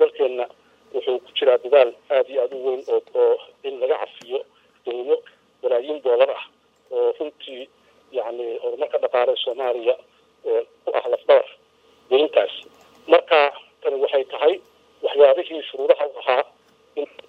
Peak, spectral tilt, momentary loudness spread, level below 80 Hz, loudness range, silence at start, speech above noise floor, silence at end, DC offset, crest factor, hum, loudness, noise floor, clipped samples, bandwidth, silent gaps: 0 dBFS; -3.5 dB/octave; 15 LU; -80 dBFS; 5 LU; 0 s; 37 dB; 0.25 s; under 0.1%; 20 dB; none; -21 LUFS; -57 dBFS; under 0.1%; 5 kHz; none